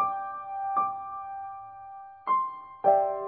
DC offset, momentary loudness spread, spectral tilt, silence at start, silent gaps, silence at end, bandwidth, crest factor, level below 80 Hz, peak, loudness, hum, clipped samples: under 0.1%; 19 LU; -8.5 dB/octave; 0 s; none; 0 s; 3.4 kHz; 20 dB; -74 dBFS; -10 dBFS; -29 LUFS; none; under 0.1%